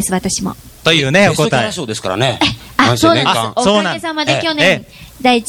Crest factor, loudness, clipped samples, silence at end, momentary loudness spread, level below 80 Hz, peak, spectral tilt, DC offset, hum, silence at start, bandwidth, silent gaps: 14 dB; -13 LUFS; under 0.1%; 0 s; 8 LU; -42 dBFS; 0 dBFS; -4 dB/octave; under 0.1%; none; 0 s; over 20 kHz; none